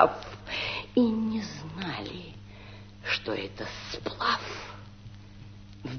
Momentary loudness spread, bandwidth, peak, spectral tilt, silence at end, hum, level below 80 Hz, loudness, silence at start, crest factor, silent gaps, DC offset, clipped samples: 22 LU; 6.6 kHz; -2 dBFS; -5 dB/octave; 0 s; none; -54 dBFS; -31 LUFS; 0 s; 28 dB; none; under 0.1%; under 0.1%